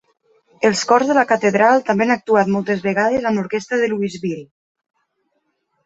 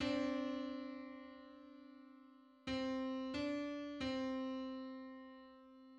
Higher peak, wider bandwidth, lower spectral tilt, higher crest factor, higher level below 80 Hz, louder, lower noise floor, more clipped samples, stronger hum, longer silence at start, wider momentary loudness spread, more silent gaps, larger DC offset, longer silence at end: first, -2 dBFS vs -26 dBFS; about the same, 8 kHz vs 8.8 kHz; about the same, -5 dB/octave vs -5 dB/octave; about the same, 16 dB vs 18 dB; first, -60 dBFS vs -70 dBFS; first, -17 LUFS vs -44 LUFS; first, -69 dBFS vs -64 dBFS; neither; neither; first, 0.6 s vs 0 s; second, 8 LU vs 19 LU; neither; neither; first, 1.4 s vs 0 s